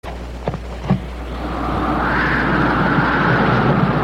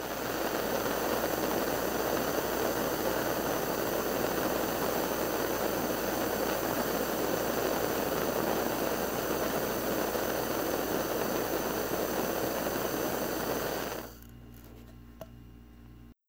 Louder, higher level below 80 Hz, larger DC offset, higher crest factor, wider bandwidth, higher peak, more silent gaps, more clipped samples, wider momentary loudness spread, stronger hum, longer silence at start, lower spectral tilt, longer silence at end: first, -18 LUFS vs -31 LUFS; first, -30 dBFS vs -52 dBFS; neither; second, 14 dB vs 20 dB; second, 12.5 kHz vs 17 kHz; first, -4 dBFS vs -12 dBFS; neither; neither; first, 12 LU vs 4 LU; neither; about the same, 0.05 s vs 0 s; first, -7.5 dB/octave vs -3.5 dB/octave; second, 0 s vs 0.15 s